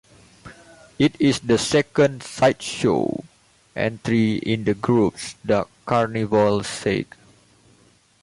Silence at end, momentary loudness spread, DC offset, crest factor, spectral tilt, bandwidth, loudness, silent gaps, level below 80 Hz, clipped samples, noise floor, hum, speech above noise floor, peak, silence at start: 1.2 s; 8 LU; under 0.1%; 16 dB; -5.5 dB/octave; 11.5 kHz; -21 LUFS; none; -52 dBFS; under 0.1%; -57 dBFS; none; 36 dB; -6 dBFS; 0.45 s